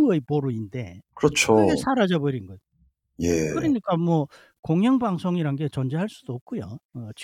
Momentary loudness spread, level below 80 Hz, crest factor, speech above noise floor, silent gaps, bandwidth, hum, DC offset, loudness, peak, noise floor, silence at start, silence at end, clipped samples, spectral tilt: 17 LU; -54 dBFS; 20 dB; 42 dB; 4.59-4.63 s, 6.41-6.46 s, 6.85-6.89 s; 17 kHz; none; under 0.1%; -24 LUFS; -4 dBFS; -65 dBFS; 0 s; 0 s; under 0.1%; -6 dB/octave